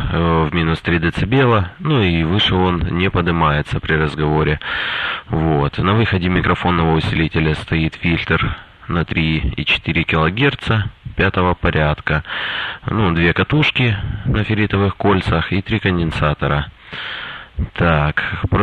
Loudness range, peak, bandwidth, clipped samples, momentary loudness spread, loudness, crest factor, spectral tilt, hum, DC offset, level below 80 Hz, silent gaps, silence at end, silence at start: 2 LU; -2 dBFS; 9 kHz; under 0.1%; 7 LU; -17 LUFS; 14 dB; -7.5 dB/octave; none; under 0.1%; -30 dBFS; none; 0 s; 0 s